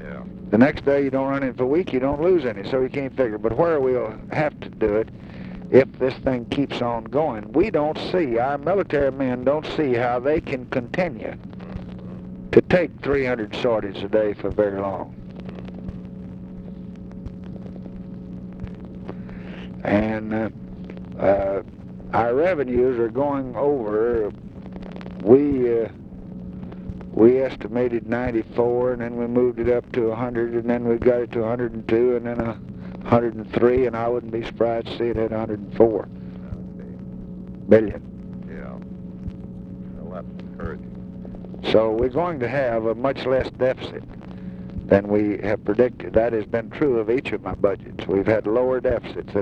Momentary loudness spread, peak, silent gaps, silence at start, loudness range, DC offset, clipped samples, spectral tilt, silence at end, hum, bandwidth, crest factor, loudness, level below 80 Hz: 17 LU; 0 dBFS; none; 0 s; 7 LU; under 0.1%; under 0.1%; -8.5 dB/octave; 0 s; none; 7.2 kHz; 22 dB; -22 LUFS; -44 dBFS